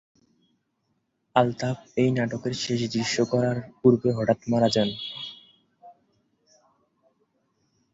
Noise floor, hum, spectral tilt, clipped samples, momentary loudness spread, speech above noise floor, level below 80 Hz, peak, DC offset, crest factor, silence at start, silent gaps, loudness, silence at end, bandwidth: -74 dBFS; none; -5.5 dB/octave; under 0.1%; 9 LU; 50 dB; -62 dBFS; -4 dBFS; under 0.1%; 24 dB; 1.35 s; none; -25 LUFS; 2.05 s; 8 kHz